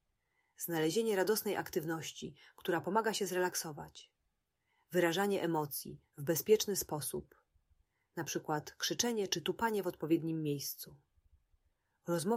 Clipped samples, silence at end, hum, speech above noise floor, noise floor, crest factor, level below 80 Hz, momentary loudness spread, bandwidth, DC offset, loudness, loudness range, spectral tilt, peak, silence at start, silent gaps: under 0.1%; 0 s; none; 48 dB; -84 dBFS; 20 dB; -72 dBFS; 13 LU; 16 kHz; under 0.1%; -36 LUFS; 3 LU; -4 dB/octave; -16 dBFS; 0.6 s; none